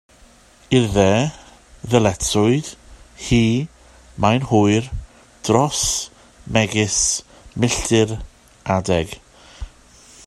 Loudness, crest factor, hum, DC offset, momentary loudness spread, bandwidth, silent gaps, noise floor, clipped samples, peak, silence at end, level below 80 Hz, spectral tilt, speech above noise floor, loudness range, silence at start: -18 LUFS; 20 dB; none; under 0.1%; 18 LU; 13 kHz; none; -49 dBFS; under 0.1%; 0 dBFS; 0.6 s; -38 dBFS; -4.5 dB/octave; 32 dB; 2 LU; 0.7 s